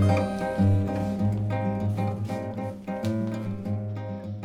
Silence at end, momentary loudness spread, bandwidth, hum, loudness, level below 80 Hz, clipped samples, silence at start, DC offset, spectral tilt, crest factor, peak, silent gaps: 0 s; 10 LU; 11 kHz; none; -28 LUFS; -52 dBFS; under 0.1%; 0 s; under 0.1%; -8.5 dB/octave; 14 dB; -12 dBFS; none